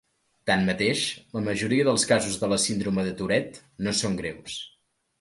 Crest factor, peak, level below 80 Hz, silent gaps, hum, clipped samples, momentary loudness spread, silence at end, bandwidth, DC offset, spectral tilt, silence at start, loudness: 20 dB; -6 dBFS; -54 dBFS; none; none; under 0.1%; 13 LU; 0.55 s; 11.5 kHz; under 0.1%; -4 dB/octave; 0.45 s; -25 LUFS